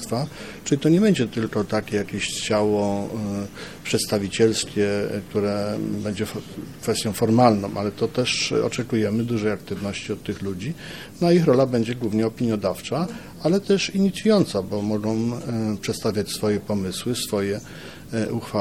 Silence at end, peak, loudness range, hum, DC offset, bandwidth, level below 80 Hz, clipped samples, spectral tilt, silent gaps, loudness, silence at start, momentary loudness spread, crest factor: 0 s; -2 dBFS; 3 LU; none; 0.3%; 16.5 kHz; -54 dBFS; under 0.1%; -5.5 dB/octave; none; -23 LUFS; 0 s; 11 LU; 22 dB